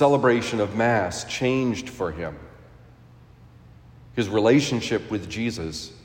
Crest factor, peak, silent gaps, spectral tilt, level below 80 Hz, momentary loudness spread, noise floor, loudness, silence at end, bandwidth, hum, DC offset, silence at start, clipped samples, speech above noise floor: 18 dB; -6 dBFS; none; -5.5 dB/octave; -52 dBFS; 14 LU; -50 dBFS; -24 LUFS; 0.05 s; 16 kHz; none; under 0.1%; 0 s; under 0.1%; 27 dB